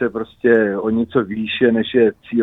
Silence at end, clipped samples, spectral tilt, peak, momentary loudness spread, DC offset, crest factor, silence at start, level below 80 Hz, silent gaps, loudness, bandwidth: 0 s; under 0.1%; -8.5 dB/octave; -2 dBFS; 5 LU; under 0.1%; 16 dB; 0 s; -52 dBFS; none; -17 LUFS; 4 kHz